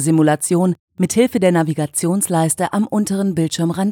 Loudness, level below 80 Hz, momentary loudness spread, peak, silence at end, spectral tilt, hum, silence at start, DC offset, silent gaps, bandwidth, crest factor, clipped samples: -17 LUFS; -58 dBFS; 4 LU; -2 dBFS; 0 s; -5.5 dB/octave; none; 0 s; under 0.1%; 0.79-0.88 s; 19 kHz; 16 dB; under 0.1%